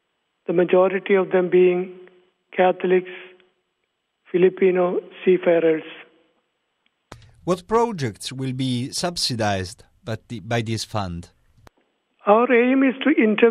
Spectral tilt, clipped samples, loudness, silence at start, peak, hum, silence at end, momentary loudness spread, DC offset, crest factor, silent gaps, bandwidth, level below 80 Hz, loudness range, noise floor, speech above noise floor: -5.5 dB/octave; under 0.1%; -20 LUFS; 0.5 s; -2 dBFS; none; 0 s; 16 LU; under 0.1%; 20 dB; none; 12.5 kHz; -58 dBFS; 6 LU; -74 dBFS; 55 dB